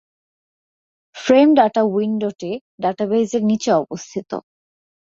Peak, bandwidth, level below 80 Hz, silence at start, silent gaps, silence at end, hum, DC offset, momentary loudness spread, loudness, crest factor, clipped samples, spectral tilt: -2 dBFS; 7.8 kHz; -64 dBFS; 1.15 s; 2.61-2.78 s; 0.75 s; none; under 0.1%; 16 LU; -18 LUFS; 18 dB; under 0.1%; -5.5 dB/octave